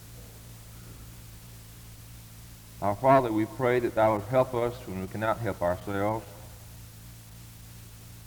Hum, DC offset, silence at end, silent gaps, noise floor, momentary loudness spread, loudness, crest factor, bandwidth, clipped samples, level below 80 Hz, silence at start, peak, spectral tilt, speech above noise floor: none; under 0.1%; 0.05 s; none; -47 dBFS; 23 LU; -27 LUFS; 22 dB; over 20 kHz; under 0.1%; -52 dBFS; 0 s; -8 dBFS; -6.5 dB/octave; 21 dB